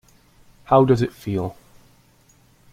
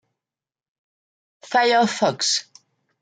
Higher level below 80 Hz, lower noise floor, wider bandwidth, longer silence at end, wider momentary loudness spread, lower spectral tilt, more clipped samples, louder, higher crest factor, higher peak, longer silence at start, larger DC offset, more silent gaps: first, -52 dBFS vs -74 dBFS; second, -56 dBFS vs under -90 dBFS; first, 15.5 kHz vs 9.6 kHz; first, 1.2 s vs 0.6 s; first, 11 LU vs 5 LU; first, -8 dB/octave vs -2.5 dB/octave; neither; about the same, -20 LUFS vs -20 LUFS; about the same, 20 dB vs 18 dB; first, -2 dBFS vs -6 dBFS; second, 0.7 s vs 1.45 s; neither; neither